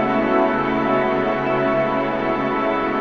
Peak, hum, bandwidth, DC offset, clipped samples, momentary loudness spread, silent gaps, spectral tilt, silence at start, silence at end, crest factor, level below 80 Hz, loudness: -6 dBFS; none; 6.6 kHz; under 0.1%; under 0.1%; 3 LU; none; -7.5 dB/octave; 0 s; 0 s; 12 dB; -44 dBFS; -19 LUFS